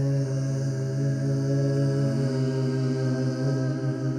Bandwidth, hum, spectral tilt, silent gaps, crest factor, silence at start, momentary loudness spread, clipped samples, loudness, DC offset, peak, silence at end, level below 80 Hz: 9.6 kHz; none; -8 dB/octave; none; 10 dB; 0 s; 3 LU; under 0.1%; -26 LUFS; under 0.1%; -16 dBFS; 0 s; -60 dBFS